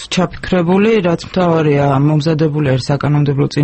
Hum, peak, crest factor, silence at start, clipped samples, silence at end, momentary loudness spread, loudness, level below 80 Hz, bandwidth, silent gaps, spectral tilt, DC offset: none; 0 dBFS; 12 dB; 0 s; under 0.1%; 0 s; 4 LU; -14 LUFS; -40 dBFS; 8.6 kHz; none; -7 dB/octave; under 0.1%